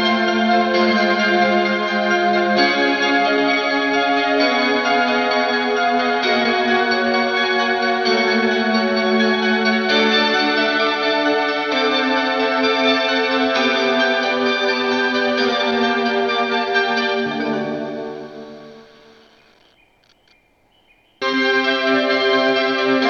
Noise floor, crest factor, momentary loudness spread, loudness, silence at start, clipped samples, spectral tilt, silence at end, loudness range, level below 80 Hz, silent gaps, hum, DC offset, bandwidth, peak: -58 dBFS; 16 dB; 3 LU; -17 LUFS; 0 s; under 0.1%; -4 dB/octave; 0 s; 7 LU; -64 dBFS; none; none; under 0.1%; 7.2 kHz; -2 dBFS